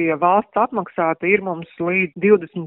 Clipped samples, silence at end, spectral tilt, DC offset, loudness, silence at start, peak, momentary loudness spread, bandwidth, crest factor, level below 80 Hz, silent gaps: under 0.1%; 0 s; -6 dB/octave; under 0.1%; -19 LUFS; 0 s; -2 dBFS; 5 LU; 4 kHz; 16 dB; -62 dBFS; none